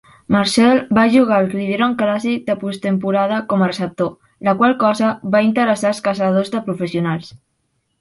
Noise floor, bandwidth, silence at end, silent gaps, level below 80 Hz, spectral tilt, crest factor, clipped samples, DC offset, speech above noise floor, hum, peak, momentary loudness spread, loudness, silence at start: -68 dBFS; 11.5 kHz; 0.65 s; none; -56 dBFS; -6 dB/octave; 16 dB; under 0.1%; under 0.1%; 52 dB; none; 0 dBFS; 9 LU; -17 LUFS; 0.3 s